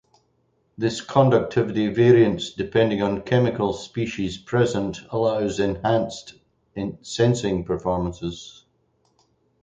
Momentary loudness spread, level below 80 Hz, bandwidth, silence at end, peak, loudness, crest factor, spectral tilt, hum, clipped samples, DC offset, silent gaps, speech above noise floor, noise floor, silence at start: 14 LU; -48 dBFS; 9 kHz; 1.15 s; -4 dBFS; -22 LUFS; 20 dB; -6.5 dB/octave; none; under 0.1%; under 0.1%; none; 45 dB; -67 dBFS; 0.8 s